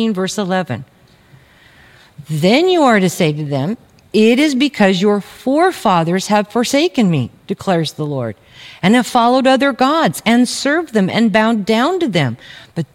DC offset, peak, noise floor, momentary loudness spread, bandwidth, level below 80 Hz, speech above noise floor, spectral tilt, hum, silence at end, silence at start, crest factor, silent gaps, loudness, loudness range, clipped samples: under 0.1%; 0 dBFS; -46 dBFS; 12 LU; 16.5 kHz; -56 dBFS; 32 dB; -5.5 dB/octave; none; 0.1 s; 0 s; 14 dB; none; -14 LUFS; 3 LU; under 0.1%